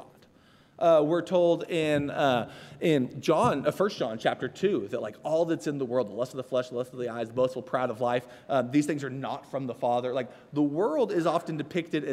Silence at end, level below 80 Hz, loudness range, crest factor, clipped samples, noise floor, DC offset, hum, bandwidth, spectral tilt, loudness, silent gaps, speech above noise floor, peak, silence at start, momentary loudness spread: 0 s; -70 dBFS; 4 LU; 18 dB; under 0.1%; -59 dBFS; under 0.1%; none; 14.5 kHz; -6 dB/octave; -28 LUFS; none; 31 dB; -10 dBFS; 0 s; 10 LU